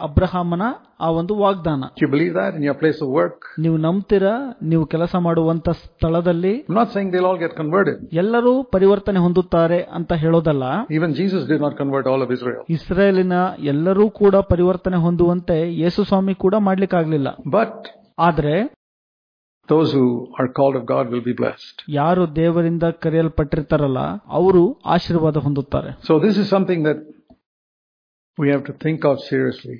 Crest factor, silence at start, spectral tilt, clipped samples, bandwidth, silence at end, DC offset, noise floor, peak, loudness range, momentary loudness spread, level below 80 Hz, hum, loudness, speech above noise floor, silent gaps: 16 dB; 0 s; -9.5 dB/octave; under 0.1%; 5.2 kHz; 0 s; under 0.1%; under -90 dBFS; -2 dBFS; 3 LU; 7 LU; -40 dBFS; none; -19 LUFS; over 72 dB; 18.76-19.61 s, 27.46-28.34 s